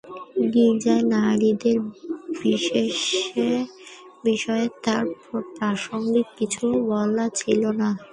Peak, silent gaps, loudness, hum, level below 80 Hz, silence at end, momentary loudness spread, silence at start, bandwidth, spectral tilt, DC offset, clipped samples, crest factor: -6 dBFS; none; -23 LUFS; none; -64 dBFS; 0.05 s; 12 LU; 0.05 s; 11 kHz; -4.5 dB/octave; under 0.1%; under 0.1%; 16 dB